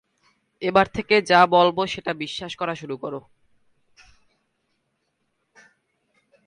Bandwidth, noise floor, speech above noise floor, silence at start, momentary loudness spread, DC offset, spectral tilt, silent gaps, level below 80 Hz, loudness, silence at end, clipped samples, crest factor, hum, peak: 11 kHz; -74 dBFS; 53 dB; 0.6 s; 16 LU; under 0.1%; -5 dB/octave; none; -58 dBFS; -21 LUFS; 3.25 s; under 0.1%; 22 dB; none; -4 dBFS